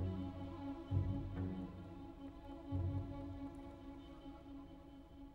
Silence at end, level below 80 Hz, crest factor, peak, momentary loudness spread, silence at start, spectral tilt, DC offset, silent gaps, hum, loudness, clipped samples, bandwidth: 0 s; -56 dBFS; 20 dB; -24 dBFS; 14 LU; 0 s; -9.5 dB/octave; under 0.1%; none; none; -47 LUFS; under 0.1%; 5.2 kHz